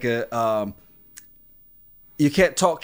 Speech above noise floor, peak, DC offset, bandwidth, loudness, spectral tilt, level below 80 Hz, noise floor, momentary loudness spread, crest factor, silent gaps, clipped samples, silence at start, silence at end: 30 dB; -4 dBFS; under 0.1%; 16 kHz; -22 LUFS; -5 dB/octave; -50 dBFS; -51 dBFS; 13 LU; 20 dB; none; under 0.1%; 0 s; 0.05 s